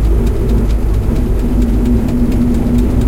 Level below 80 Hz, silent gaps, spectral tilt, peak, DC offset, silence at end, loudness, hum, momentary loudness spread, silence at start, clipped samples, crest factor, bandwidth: -14 dBFS; none; -8.5 dB/octave; -2 dBFS; under 0.1%; 0 s; -14 LUFS; none; 2 LU; 0 s; under 0.1%; 10 dB; 15.5 kHz